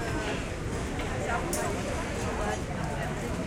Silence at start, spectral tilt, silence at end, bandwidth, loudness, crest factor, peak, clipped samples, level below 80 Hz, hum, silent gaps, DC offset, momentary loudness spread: 0 s; -5 dB/octave; 0 s; 16.5 kHz; -32 LUFS; 14 dB; -16 dBFS; under 0.1%; -40 dBFS; none; none; under 0.1%; 3 LU